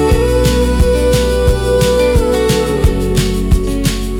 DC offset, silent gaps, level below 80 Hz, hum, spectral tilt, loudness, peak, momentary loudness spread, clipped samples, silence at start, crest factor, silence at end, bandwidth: under 0.1%; none; -16 dBFS; none; -5.5 dB/octave; -13 LUFS; -2 dBFS; 3 LU; under 0.1%; 0 s; 10 dB; 0 s; 18 kHz